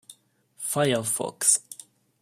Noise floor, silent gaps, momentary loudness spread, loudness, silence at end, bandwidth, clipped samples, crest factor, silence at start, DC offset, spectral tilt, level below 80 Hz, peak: -57 dBFS; none; 19 LU; -24 LUFS; 0.5 s; 16 kHz; under 0.1%; 24 dB; 0.1 s; under 0.1%; -2.5 dB/octave; -72 dBFS; -4 dBFS